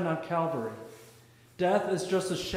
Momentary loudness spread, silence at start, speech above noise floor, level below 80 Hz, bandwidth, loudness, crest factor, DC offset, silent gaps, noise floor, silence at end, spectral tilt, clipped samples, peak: 14 LU; 0 s; 27 dB; -62 dBFS; 16 kHz; -30 LUFS; 18 dB; under 0.1%; none; -57 dBFS; 0 s; -5 dB/octave; under 0.1%; -14 dBFS